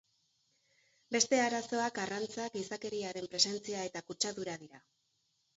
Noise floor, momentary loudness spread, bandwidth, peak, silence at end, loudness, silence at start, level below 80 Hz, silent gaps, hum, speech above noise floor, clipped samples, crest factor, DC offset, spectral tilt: -78 dBFS; 11 LU; 7.6 kHz; -12 dBFS; 0.8 s; -35 LUFS; 1.1 s; -78 dBFS; none; none; 43 dB; under 0.1%; 24 dB; under 0.1%; -1.5 dB/octave